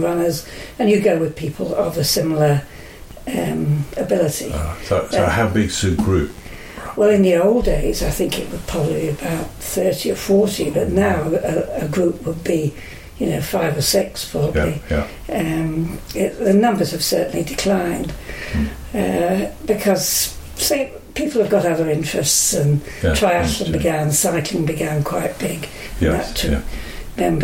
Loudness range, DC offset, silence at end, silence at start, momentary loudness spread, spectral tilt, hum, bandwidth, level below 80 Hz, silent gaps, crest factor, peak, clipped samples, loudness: 3 LU; under 0.1%; 0 s; 0 s; 10 LU; -4.5 dB/octave; none; 17 kHz; -32 dBFS; none; 16 dB; -4 dBFS; under 0.1%; -19 LUFS